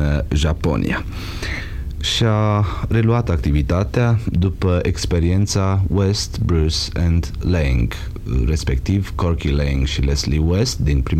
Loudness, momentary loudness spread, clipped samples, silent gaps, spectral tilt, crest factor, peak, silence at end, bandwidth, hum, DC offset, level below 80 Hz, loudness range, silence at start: -19 LUFS; 7 LU; under 0.1%; none; -6 dB/octave; 12 dB; -4 dBFS; 0 s; 14 kHz; none; under 0.1%; -24 dBFS; 2 LU; 0 s